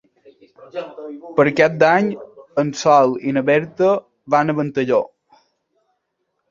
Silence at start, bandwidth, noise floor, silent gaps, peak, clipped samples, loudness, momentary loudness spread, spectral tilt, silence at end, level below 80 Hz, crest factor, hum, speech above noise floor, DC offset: 0.6 s; 7.6 kHz; -73 dBFS; none; -2 dBFS; under 0.1%; -17 LUFS; 18 LU; -6 dB/octave; 1.45 s; -62 dBFS; 18 dB; none; 56 dB; under 0.1%